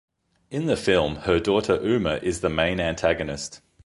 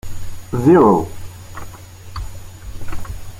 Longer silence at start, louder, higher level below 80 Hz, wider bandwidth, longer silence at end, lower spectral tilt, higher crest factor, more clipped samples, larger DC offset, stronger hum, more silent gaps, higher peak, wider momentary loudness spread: first, 0.5 s vs 0.05 s; second, -24 LUFS vs -14 LUFS; second, -44 dBFS vs -34 dBFS; second, 11.5 kHz vs 16.5 kHz; first, 0.3 s vs 0 s; second, -5 dB/octave vs -7.5 dB/octave; about the same, 18 dB vs 16 dB; neither; neither; neither; neither; second, -6 dBFS vs -2 dBFS; second, 9 LU vs 25 LU